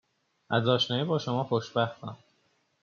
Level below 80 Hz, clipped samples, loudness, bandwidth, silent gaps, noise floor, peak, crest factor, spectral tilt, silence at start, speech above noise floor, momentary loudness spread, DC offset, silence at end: -72 dBFS; under 0.1%; -28 LUFS; 7.2 kHz; none; -71 dBFS; -10 dBFS; 22 dB; -4 dB/octave; 0.5 s; 43 dB; 9 LU; under 0.1%; 0.7 s